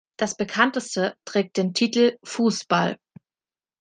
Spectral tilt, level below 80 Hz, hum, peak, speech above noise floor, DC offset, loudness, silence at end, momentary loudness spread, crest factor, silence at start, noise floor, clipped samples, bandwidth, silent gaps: -4 dB/octave; -70 dBFS; none; -2 dBFS; over 67 dB; under 0.1%; -23 LUFS; 0.85 s; 6 LU; 22 dB; 0.2 s; under -90 dBFS; under 0.1%; 9.8 kHz; none